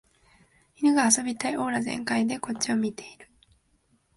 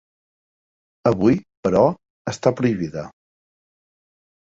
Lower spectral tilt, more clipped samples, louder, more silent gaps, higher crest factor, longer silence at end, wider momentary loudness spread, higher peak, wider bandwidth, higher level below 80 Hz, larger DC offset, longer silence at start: second, -3 dB/octave vs -7.5 dB/octave; neither; second, -25 LUFS vs -20 LUFS; second, none vs 1.57-1.63 s, 2.10-2.25 s; about the same, 22 dB vs 20 dB; second, 0.9 s vs 1.4 s; second, 9 LU vs 14 LU; second, -6 dBFS vs -2 dBFS; first, 12 kHz vs 7.8 kHz; second, -66 dBFS vs -52 dBFS; neither; second, 0.8 s vs 1.05 s